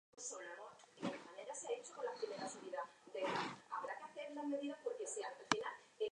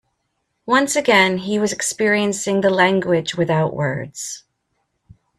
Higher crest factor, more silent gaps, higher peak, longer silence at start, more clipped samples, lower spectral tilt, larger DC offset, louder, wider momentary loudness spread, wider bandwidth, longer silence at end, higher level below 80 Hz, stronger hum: first, 32 dB vs 18 dB; neither; second, -14 dBFS vs -2 dBFS; second, 0.15 s vs 0.65 s; neither; about the same, -3 dB/octave vs -4 dB/octave; neither; second, -46 LUFS vs -18 LUFS; second, 10 LU vs 14 LU; second, 10.5 kHz vs 14 kHz; second, 0 s vs 1 s; second, -86 dBFS vs -58 dBFS; neither